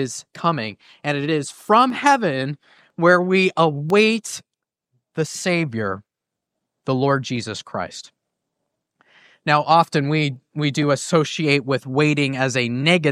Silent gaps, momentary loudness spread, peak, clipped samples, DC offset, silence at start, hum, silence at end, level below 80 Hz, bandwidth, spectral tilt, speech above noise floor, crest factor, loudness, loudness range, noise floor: none; 13 LU; -2 dBFS; under 0.1%; under 0.1%; 0 s; none; 0 s; -66 dBFS; 14.5 kHz; -5 dB/octave; 64 dB; 20 dB; -20 LUFS; 7 LU; -83 dBFS